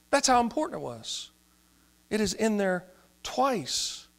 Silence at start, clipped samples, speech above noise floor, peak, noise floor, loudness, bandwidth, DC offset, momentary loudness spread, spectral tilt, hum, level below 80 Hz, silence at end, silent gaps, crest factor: 0.1 s; under 0.1%; 35 dB; -10 dBFS; -63 dBFS; -28 LUFS; 16 kHz; under 0.1%; 13 LU; -3 dB/octave; none; -56 dBFS; 0.15 s; none; 20 dB